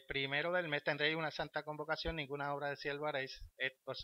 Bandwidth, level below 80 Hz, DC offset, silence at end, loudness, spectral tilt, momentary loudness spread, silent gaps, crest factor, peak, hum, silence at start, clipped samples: 16 kHz; -60 dBFS; under 0.1%; 0 s; -39 LUFS; -5 dB/octave; 7 LU; none; 20 dB; -20 dBFS; none; 0 s; under 0.1%